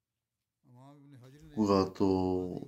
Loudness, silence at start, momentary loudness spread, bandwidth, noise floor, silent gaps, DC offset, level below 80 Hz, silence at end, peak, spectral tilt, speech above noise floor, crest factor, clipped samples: -30 LUFS; 0.85 s; 5 LU; 8.8 kHz; -89 dBFS; none; under 0.1%; -68 dBFS; 0 s; -14 dBFS; -7.5 dB/octave; 58 dB; 20 dB; under 0.1%